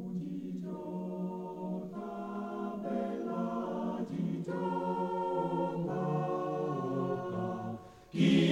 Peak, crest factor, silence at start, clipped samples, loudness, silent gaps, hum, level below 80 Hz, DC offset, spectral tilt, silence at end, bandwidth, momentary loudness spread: -14 dBFS; 20 dB; 0 s; under 0.1%; -36 LUFS; none; none; -70 dBFS; under 0.1%; -7.5 dB/octave; 0 s; 10.5 kHz; 7 LU